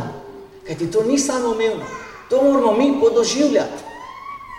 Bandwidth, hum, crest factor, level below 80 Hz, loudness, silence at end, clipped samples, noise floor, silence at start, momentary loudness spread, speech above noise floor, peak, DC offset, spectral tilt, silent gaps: 13 kHz; none; 14 dB; -52 dBFS; -18 LUFS; 0 s; under 0.1%; -38 dBFS; 0 s; 19 LU; 21 dB; -4 dBFS; under 0.1%; -4 dB/octave; none